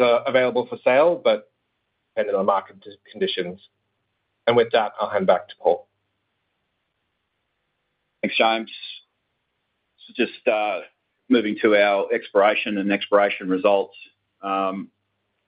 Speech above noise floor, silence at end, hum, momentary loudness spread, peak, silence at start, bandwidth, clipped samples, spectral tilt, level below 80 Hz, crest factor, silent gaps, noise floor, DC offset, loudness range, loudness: 54 dB; 0.6 s; none; 14 LU; -4 dBFS; 0 s; 5.2 kHz; under 0.1%; -9 dB/octave; -72 dBFS; 20 dB; none; -75 dBFS; under 0.1%; 8 LU; -21 LUFS